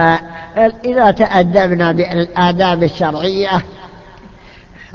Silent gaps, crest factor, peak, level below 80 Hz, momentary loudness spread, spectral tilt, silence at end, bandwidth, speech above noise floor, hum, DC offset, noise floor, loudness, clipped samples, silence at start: none; 14 dB; 0 dBFS; -42 dBFS; 7 LU; -7 dB/octave; 0.1 s; 7 kHz; 27 dB; none; under 0.1%; -39 dBFS; -13 LUFS; under 0.1%; 0 s